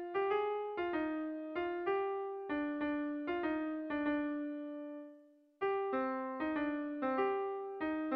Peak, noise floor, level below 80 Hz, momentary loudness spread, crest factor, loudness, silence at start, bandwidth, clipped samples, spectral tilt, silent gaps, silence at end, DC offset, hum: -24 dBFS; -62 dBFS; -72 dBFS; 6 LU; 14 dB; -38 LUFS; 0 s; 5 kHz; under 0.1%; -7.5 dB/octave; none; 0 s; under 0.1%; none